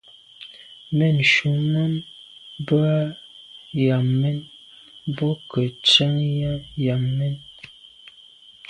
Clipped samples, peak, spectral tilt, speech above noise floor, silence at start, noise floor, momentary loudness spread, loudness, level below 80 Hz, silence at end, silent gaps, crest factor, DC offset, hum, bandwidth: under 0.1%; -2 dBFS; -6 dB/octave; 28 dB; 0.4 s; -49 dBFS; 25 LU; -21 LUFS; -56 dBFS; 1.05 s; none; 20 dB; under 0.1%; none; 10 kHz